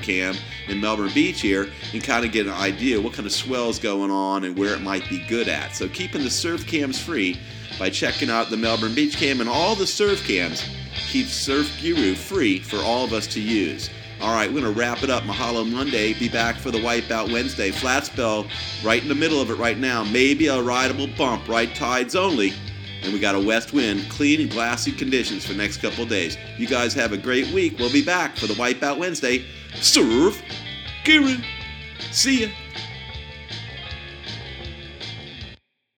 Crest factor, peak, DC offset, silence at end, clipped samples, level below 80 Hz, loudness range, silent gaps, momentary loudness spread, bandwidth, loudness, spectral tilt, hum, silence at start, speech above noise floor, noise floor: 22 dB; -2 dBFS; under 0.1%; 0.45 s; under 0.1%; -44 dBFS; 4 LU; none; 13 LU; 19.5 kHz; -22 LUFS; -3.5 dB/octave; none; 0 s; 24 dB; -46 dBFS